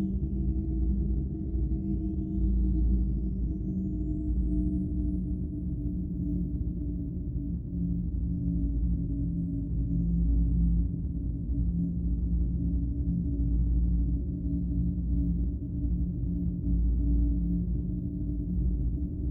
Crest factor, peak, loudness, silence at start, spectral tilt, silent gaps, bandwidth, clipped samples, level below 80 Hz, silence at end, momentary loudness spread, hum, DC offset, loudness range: 12 dB; -18 dBFS; -31 LUFS; 0 s; -14 dB/octave; none; 0.9 kHz; under 0.1%; -30 dBFS; 0 s; 5 LU; none; under 0.1%; 2 LU